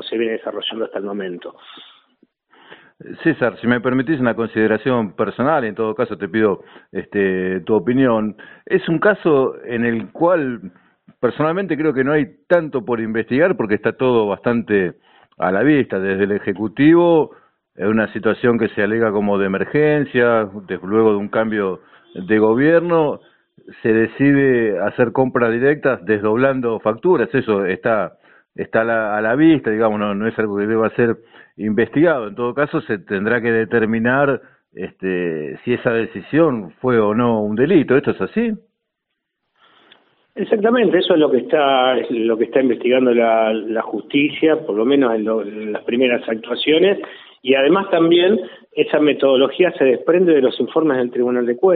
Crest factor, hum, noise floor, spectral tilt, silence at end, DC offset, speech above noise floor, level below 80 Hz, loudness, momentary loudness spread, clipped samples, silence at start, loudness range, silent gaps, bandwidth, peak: 16 dB; none; -77 dBFS; -4.5 dB/octave; 0 s; under 0.1%; 60 dB; -54 dBFS; -17 LUFS; 9 LU; under 0.1%; 0 s; 4 LU; none; 4.4 kHz; 0 dBFS